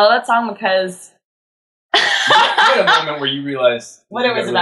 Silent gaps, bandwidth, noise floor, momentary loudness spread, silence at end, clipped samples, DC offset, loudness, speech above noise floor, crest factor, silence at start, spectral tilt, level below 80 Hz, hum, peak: 1.25-1.89 s; 12.5 kHz; under -90 dBFS; 9 LU; 0 s; under 0.1%; under 0.1%; -14 LUFS; over 75 dB; 14 dB; 0 s; -2.5 dB/octave; -70 dBFS; none; -2 dBFS